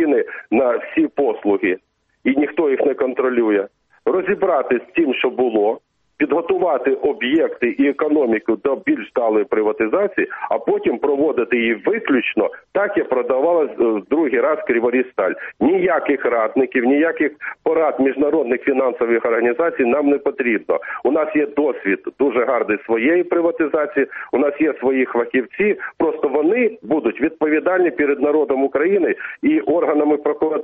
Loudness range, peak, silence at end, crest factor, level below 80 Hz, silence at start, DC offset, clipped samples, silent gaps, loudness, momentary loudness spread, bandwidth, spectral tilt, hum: 1 LU; -6 dBFS; 0 s; 12 dB; -60 dBFS; 0 s; under 0.1%; under 0.1%; none; -18 LUFS; 4 LU; 3.8 kHz; -4 dB/octave; none